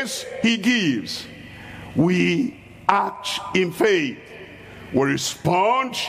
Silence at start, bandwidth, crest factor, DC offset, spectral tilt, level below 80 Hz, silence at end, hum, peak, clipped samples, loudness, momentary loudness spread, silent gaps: 0 s; 15.5 kHz; 22 dB; under 0.1%; -4.5 dB/octave; -56 dBFS; 0 s; none; 0 dBFS; under 0.1%; -21 LUFS; 19 LU; none